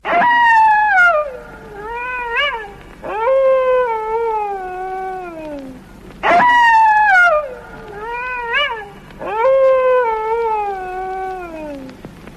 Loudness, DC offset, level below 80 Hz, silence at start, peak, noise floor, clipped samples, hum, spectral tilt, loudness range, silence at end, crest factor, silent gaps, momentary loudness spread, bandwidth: -14 LUFS; under 0.1%; -44 dBFS; 0.05 s; -4 dBFS; -37 dBFS; under 0.1%; none; -4 dB/octave; 5 LU; 0 s; 12 dB; none; 21 LU; 12.5 kHz